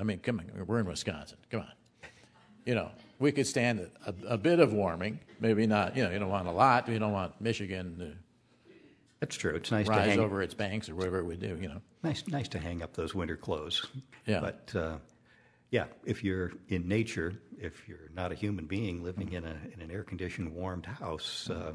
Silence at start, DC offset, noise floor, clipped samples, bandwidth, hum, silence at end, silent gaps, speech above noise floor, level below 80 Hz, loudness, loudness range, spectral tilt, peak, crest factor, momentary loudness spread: 0 s; under 0.1%; -64 dBFS; under 0.1%; 11 kHz; none; 0 s; none; 31 dB; -56 dBFS; -33 LUFS; 8 LU; -5.5 dB/octave; -10 dBFS; 24 dB; 15 LU